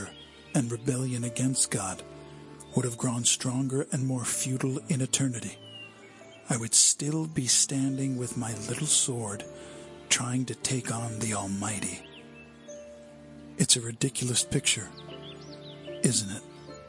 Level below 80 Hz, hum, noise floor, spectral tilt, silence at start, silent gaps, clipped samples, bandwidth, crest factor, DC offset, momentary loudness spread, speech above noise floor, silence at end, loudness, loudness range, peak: -64 dBFS; none; -50 dBFS; -3 dB/octave; 0 s; none; under 0.1%; 11.5 kHz; 24 dB; under 0.1%; 22 LU; 21 dB; 0 s; -27 LUFS; 6 LU; -6 dBFS